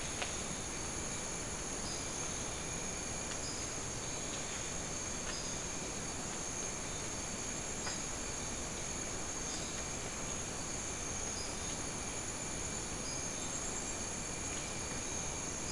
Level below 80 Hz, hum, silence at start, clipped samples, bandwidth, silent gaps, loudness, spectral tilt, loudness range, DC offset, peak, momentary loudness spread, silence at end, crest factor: -52 dBFS; none; 0 s; under 0.1%; 12 kHz; none; -39 LUFS; -2 dB/octave; 0 LU; 0.2%; -22 dBFS; 1 LU; 0 s; 20 dB